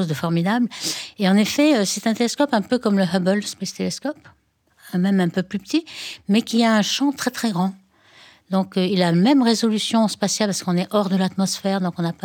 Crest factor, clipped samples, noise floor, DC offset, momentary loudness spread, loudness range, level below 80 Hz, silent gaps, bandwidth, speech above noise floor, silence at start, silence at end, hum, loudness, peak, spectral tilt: 16 dB; under 0.1%; -55 dBFS; under 0.1%; 9 LU; 3 LU; -66 dBFS; none; 19 kHz; 35 dB; 0 s; 0.15 s; none; -20 LUFS; -6 dBFS; -5 dB/octave